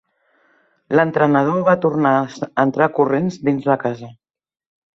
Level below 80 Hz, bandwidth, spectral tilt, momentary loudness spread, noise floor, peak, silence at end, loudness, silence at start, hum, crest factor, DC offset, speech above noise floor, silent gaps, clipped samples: -62 dBFS; 7.6 kHz; -8 dB/octave; 5 LU; -60 dBFS; -2 dBFS; 0.8 s; -17 LUFS; 0.9 s; none; 16 dB; under 0.1%; 44 dB; none; under 0.1%